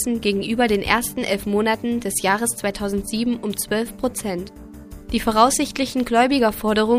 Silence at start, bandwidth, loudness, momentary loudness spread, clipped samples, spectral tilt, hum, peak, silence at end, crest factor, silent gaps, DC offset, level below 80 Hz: 0 s; 15.5 kHz; -21 LUFS; 10 LU; under 0.1%; -3.5 dB/octave; none; 0 dBFS; 0 s; 20 dB; none; under 0.1%; -42 dBFS